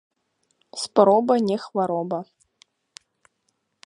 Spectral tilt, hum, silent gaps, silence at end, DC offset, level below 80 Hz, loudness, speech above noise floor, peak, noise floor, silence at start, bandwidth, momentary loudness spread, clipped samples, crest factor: -5.5 dB/octave; none; none; 1.65 s; under 0.1%; -74 dBFS; -21 LUFS; 53 dB; -2 dBFS; -73 dBFS; 0.75 s; 11 kHz; 15 LU; under 0.1%; 22 dB